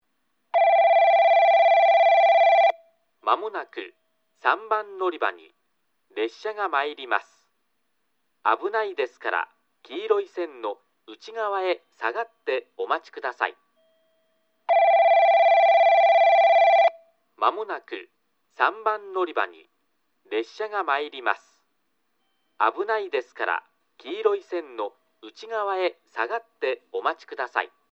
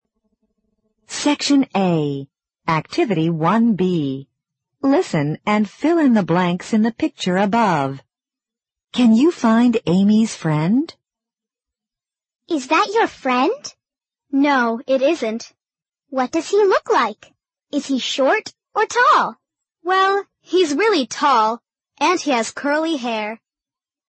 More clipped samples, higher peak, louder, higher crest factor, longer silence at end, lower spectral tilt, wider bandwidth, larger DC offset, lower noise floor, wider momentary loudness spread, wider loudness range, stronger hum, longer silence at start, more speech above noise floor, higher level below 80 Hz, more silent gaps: neither; about the same, -4 dBFS vs -4 dBFS; second, -22 LUFS vs -18 LUFS; first, 20 dB vs 14 dB; second, 0.25 s vs 0.75 s; second, -2 dB/octave vs -5.5 dB/octave; second, 6.4 kHz vs 8.8 kHz; neither; second, -75 dBFS vs under -90 dBFS; first, 16 LU vs 11 LU; first, 11 LU vs 3 LU; neither; second, 0.55 s vs 1.1 s; second, 48 dB vs over 73 dB; second, under -90 dBFS vs -62 dBFS; neither